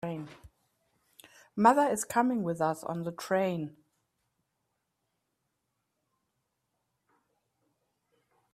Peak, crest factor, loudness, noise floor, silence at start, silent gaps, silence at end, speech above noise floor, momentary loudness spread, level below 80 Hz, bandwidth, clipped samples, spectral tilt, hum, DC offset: -8 dBFS; 26 dB; -29 LUFS; -82 dBFS; 0.05 s; none; 4.85 s; 53 dB; 18 LU; -74 dBFS; 15.5 kHz; under 0.1%; -5.5 dB/octave; none; under 0.1%